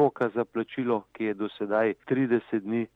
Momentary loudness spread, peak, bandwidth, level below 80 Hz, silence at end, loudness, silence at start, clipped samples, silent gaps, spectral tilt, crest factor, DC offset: 5 LU; -10 dBFS; 4.6 kHz; -74 dBFS; 0.1 s; -28 LUFS; 0 s; under 0.1%; none; -9 dB/octave; 16 dB; under 0.1%